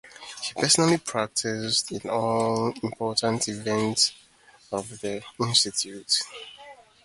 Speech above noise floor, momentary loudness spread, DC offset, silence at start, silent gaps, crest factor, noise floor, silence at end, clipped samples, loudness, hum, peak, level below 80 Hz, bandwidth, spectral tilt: 23 dB; 13 LU; under 0.1%; 0.05 s; none; 22 dB; -49 dBFS; 0.25 s; under 0.1%; -25 LUFS; none; -6 dBFS; -64 dBFS; 12 kHz; -3 dB/octave